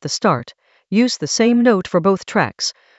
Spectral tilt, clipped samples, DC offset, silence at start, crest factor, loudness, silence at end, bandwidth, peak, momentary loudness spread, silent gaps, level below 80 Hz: -4.5 dB/octave; under 0.1%; under 0.1%; 0 s; 16 dB; -17 LUFS; 0.25 s; 8.2 kHz; 0 dBFS; 7 LU; none; -58 dBFS